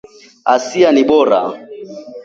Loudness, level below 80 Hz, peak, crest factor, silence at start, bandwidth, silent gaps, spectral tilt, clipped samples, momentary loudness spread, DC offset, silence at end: -13 LUFS; -56 dBFS; 0 dBFS; 14 dB; 0.45 s; 7.8 kHz; none; -4.5 dB/octave; under 0.1%; 20 LU; under 0.1%; 0 s